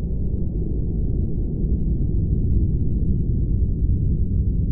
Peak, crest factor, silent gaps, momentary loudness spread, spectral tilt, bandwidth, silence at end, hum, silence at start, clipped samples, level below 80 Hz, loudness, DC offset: -8 dBFS; 12 dB; none; 4 LU; -19 dB/octave; 0.9 kHz; 0 s; none; 0 s; under 0.1%; -22 dBFS; -23 LUFS; under 0.1%